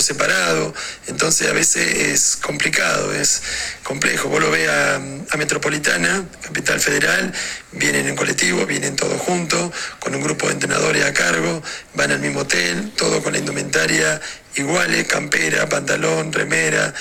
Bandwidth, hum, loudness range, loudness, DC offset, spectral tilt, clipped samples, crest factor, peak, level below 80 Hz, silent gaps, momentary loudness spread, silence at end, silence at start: 18 kHz; none; 2 LU; -18 LUFS; under 0.1%; -2.5 dB/octave; under 0.1%; 18 dB; 0 dBFS; -48 dBFS; none; 8 LU; 0 s; 0 s